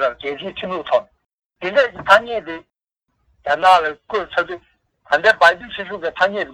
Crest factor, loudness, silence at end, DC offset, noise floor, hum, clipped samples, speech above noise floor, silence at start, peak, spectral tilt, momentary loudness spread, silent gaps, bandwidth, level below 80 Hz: 18 dB; -18 LUFS; 0 s; under 0.1%; -73 dBFS; none; under 0.1%; 55 dB; 0 s; 0 dBFS; -3.5 dB/octave; 15 LU; 1.33-1.38 s; 14 kHz; -56 dBFS